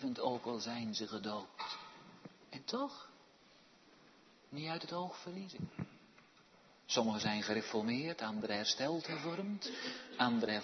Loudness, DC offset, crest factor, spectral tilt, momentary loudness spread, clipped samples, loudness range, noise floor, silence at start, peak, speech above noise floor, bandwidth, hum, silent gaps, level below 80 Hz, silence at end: -40 LUFS; under 0.1%; 24 dB; -3 dB/octave; 16 LU; under 0.1%; 10 LU; -65 dBFS; 0 s; -18 dBFS; 26 dB; 6.2 kHz; none; none; -80 dBFS; 0 s